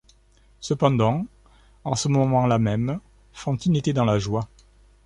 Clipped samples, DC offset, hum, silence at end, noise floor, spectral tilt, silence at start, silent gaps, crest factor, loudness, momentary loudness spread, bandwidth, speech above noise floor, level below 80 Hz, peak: under 0.1%; under 0.1%; none; 0.6 s; -57 dBFS; -6.5 dB/octave; 0.6 s; none; 20 dB; -23 LUFS; 15 LU; 11 kHz; 35 dB; -48 dBFS; -4 dBFS